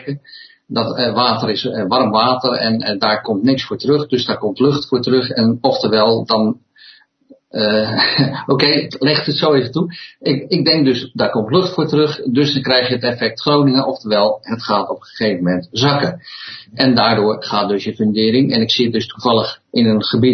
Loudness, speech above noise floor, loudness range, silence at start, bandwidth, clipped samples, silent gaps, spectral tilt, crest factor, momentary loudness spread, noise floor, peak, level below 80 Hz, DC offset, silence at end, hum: -15 LUFS; 33 dB; 1 LU; 0 s; 6.4 kHz; under 0.1%; none; -6.5 dB/octave; 16 dB; 7 LU; -49 dBFS; 0 dBFS; -56 dBFS; under 0.1%; 0 s; none